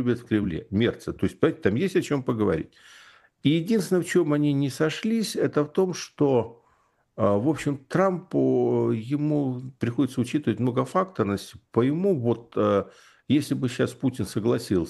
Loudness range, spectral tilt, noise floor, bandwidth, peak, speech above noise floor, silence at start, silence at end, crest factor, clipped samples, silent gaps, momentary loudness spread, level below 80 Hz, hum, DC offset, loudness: 1 LU; -6.5 dB/octave; -66 dBFS; 12.5 kHz; -6 dBFS; 41 dB; 0 s; 0 s; 20 dB; under 0.1%; none; 5 LU; -58 dBFS; none; under 0.1%; -25 LUFS